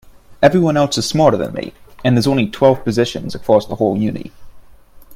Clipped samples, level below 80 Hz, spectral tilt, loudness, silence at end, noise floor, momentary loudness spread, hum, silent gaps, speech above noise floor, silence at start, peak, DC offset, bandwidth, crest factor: under 0.1%; -44 dBFS; -6 dB/octave; -15 LUFS; 0 s; -41 dBFS; 11 LU; none; none; 26 dB; 0.3 s; 0 dBFS; under 0.1%; 16 kHz; 16 dB